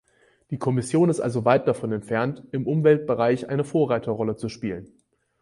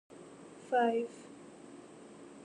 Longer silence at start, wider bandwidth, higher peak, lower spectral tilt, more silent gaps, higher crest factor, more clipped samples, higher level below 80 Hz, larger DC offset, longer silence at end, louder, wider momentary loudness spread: first, 0.5 s vs 0.1 s; about the same, 11.5 kHz vs 10.5 kHz; first, -4 dBFS vs -20 dBFS; first, -7.5 dB/octave vs -5 dB/octave; neither; about the same, 18 dB vs 18 dB; neither; first, -60 dBFS vs -82 dBFS; neither; first, 0.55 s vs 0.05 s; first, -23 LUFS vs -33 LUFS; second, 10 LU vs 22 LU